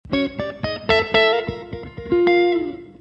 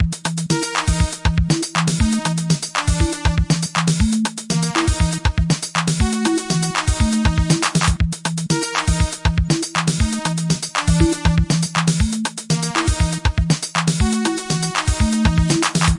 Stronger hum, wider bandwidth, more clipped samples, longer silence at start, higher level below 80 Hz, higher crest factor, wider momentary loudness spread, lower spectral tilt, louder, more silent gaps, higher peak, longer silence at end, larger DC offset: neither; second, 7.8 kHz vs 11.5 kHz; neither; about the same, 0.05 s vs 0 s; second, -46 dBFS vs -26 dBFS; about the same, 20 dB vs 16 dB; first, 15 LU vs 4 LU; first, -6.5 dB/octave vs -4.5 dB/octave; about the same, -19 LUFS vs -19 LUFS; neither; about the same, 0 dBFS vs -2 dBFS; about the same, 0.1 s vs 0 s; neither